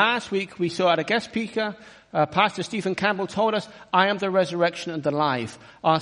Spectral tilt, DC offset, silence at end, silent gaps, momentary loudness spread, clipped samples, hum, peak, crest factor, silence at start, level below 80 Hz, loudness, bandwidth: -5 dB/octave; under 0.1%; 0 s; none; 8 LU; under 0.1%; none; -4 dBFS; 20 dB; 0 s; -64 dBFS; -24 LUFS; 10.5 kHz